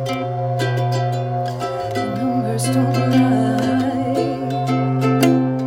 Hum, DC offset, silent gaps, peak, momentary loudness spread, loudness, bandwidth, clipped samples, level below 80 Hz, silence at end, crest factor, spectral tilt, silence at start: none; under 0.1%; none; -2 dBFS; 7 LU; -19 LUFS; 16.5 kHz; under 0.1%; -52 dBFS; 0 s; 16 dB; -6.5 dB/octave; 0 s